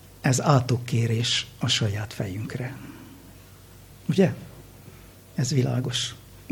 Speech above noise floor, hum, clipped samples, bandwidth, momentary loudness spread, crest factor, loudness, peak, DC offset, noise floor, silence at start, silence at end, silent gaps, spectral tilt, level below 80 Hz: 23 dB; none; under 0.1%; 19 kHz; 21 LU; 22 dB; -25 LUFS; -4 dBFS; under 0.1%; -48 dBFS; 0.05 s; 0.1 s; none; -5 dB/octave; -54 dBFS